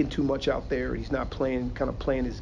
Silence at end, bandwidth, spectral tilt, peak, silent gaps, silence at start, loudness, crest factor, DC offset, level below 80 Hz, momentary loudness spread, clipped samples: 0 s; 7.6 kHz; -7 dB/octave; -12 dBFS; none; 0 s; -29 LUFS; 16 dB; under 0.1%; -38 dBFS; 4 LU; under 0.1%